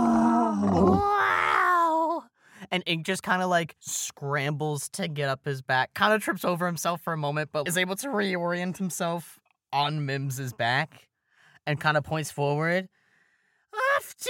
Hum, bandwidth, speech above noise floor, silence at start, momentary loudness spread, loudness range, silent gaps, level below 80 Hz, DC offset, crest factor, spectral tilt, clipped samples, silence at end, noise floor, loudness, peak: none; 17 kHz; 41 dB; 0 s; 9 LU; 5 LU; none; -58 dBFS; under 0.1%; 20 dB; -4.5 dB/octave; under 0.1%; 0 s; -69 dBFS; -26 LUFS; -8 dBFS